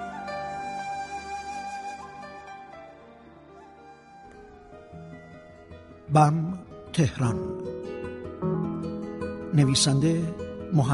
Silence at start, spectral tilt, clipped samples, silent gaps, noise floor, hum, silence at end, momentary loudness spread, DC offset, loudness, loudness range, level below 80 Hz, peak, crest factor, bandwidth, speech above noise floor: 0 s; -5.5 dB/octave; under 0.1%; none; -49 dBFS; none; 0 s; 27 LU; under 0.1%; -27 LUFS; 20 LU; -54 dBFS; -6 dBFS; 22 dB; 11.5 kHz; 27 dB